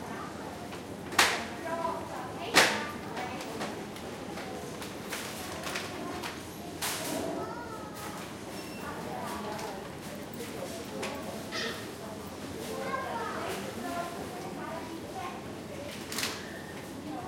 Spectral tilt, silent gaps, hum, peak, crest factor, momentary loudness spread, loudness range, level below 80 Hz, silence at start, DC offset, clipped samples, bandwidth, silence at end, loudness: -3 dB/octave; none; none; -6 dBFS; 30 dB; 13 LU; 9 LU; -62 dBFS; 0 s; under 0.1%; under 0.1%; 16.5 kHz; 0 s; -35 LUFS